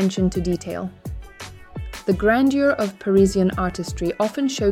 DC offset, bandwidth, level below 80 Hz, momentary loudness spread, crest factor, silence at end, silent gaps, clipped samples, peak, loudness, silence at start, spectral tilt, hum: under 0.1%; 15.5 kHz; -38 dBFS; 19 LU; 16 dB; 0 s; none; under 0.1%; -6 dBFS; -21 LUFS; 0 s; -6 dB/octave; none